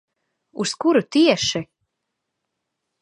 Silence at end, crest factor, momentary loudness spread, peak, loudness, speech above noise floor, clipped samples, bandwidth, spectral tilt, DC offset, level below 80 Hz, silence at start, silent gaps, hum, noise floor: 1.4 s; 20 dB; 12 LU; -2 dBFS; -19 LUFS; 60 dB; under 0.1%; 11.5 kHz; -4 dB/octave; under 0.1%; -60 dBFS; 0.55 s; none; none; -79 dBFS